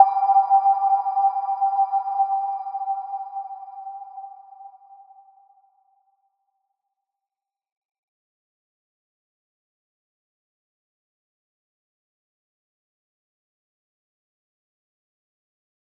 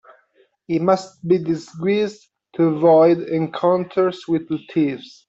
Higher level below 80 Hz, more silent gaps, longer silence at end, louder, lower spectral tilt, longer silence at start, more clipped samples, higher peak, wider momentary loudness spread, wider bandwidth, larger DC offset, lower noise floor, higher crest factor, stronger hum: second, under -90 dBFS vs -64 dBFS; neither; first, 11.3 s vs 0.2 s; about the same, -21 LUFS vs -19 LUFS; second, -3 dB/octave vs -7.5 dB/octave; second, 0 s vs 0.7 s; neither; about the same, -2 dBFS vs -4 dBFS; first, 20 LU vs 10 LU; second, 5.2 kHz vs 8 kHz; neither; first, -89 dBFS vs -60 dBFS; first, 26 dB vs 16 dB; neither